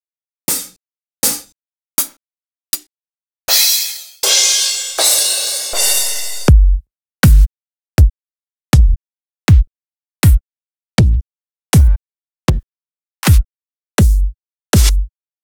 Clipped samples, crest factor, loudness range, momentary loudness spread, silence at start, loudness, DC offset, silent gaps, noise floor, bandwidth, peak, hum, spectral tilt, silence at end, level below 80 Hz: under 0.1%; 14 dB; 4 LU; 12 LU; 0.5 s; -14 LUFS; under 0.1%; 2.91-2.95 s, 8.43-8.48 s, 8.61-8.65 s; under -90 dBFS; over 20 kHz; 0 dBFS; none; -3.5 dB/octave; 0.35 s; -16 dBFS